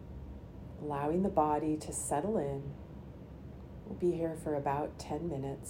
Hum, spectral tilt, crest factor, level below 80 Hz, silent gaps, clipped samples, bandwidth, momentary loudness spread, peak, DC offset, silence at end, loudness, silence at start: none; -6.5 dB/octave; 20 dB; -54 dBFS; none; under 0.1%; 16 kHz; 18 LU; -16 dBFS; under 0.1%; 0 s; -35 LUFS; 0 s